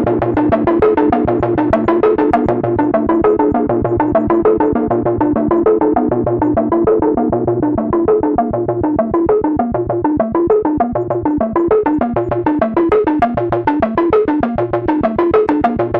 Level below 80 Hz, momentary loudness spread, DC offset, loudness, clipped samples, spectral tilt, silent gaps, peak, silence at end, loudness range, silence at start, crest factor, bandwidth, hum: -36 dBFS; 4 LU; under 0.1%; -14 LUFS; under 0.1%; -10.5 dB/octave; none; 0 dBFS; 0 s; 2 LU; 0 s; 14 dB; 4.8 kHz; none